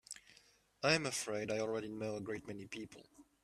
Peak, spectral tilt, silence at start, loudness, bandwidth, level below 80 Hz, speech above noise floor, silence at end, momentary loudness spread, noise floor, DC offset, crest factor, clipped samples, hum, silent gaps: -18 dBFS; -3.5 dB/octave; 0.1 s; -39 LUFS; 14.5 kHz; -74 dBFS; 29 dB; 0.2 s; 19 LU; -68 dBFS; under 0.1%; 22 dB; under 0.1%; none; none